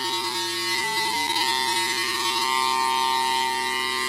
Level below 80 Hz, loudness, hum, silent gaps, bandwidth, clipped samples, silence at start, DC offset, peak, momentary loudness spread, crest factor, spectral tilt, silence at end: -60 dBFS; -22 LUFS; none; none; 16 kHz; under 0.1%; 0 s; under 0.1%; -10 dBFS; 3 LU; 14 dB; 0 dB/octave; 0 s